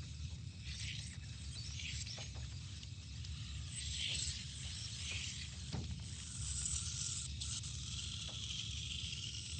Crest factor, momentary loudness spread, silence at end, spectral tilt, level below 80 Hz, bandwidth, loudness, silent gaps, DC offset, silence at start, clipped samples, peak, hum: 20 dB; 9 LU; 0 s; -2 dB/octave; -52 dBFS; 9.4 kHz; -43 LUFS; none; under 0.1%; 0 s; under 0.1%; -26 dBFS; none